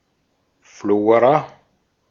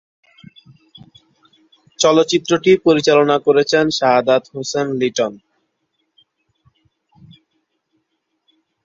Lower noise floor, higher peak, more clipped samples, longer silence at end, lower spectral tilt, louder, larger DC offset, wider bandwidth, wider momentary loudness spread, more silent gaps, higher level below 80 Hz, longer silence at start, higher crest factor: second, -67 dBFS vs -71 dBFS; about the same, -2 dBFS vs 0 dBFS; neither; second, 0.65 s vs 3.5 s; first, -7.5 dB/octave vs -4 dB/octave; about the same, -17 LUFS vs -15 LUFS; neither; about the same, 7.2 kHz vs 7.8 kHz; first, 16 LU vs 8 LU; neither; second, -66 dBFS vs -60 dBFS; second, 0.85 s vs 2 s; about the same, 18 dB vs 18 dB